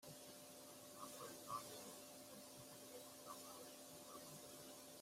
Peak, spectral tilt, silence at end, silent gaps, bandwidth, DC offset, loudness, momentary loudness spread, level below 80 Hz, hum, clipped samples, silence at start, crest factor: -36 dBFS; -2.5 dB/octave; 0 s; none; 16 kHz; under 0.1%; -56 LUFS; 7 LU; -90 dBFS; none; under 0.1%; 0 s; 20 dB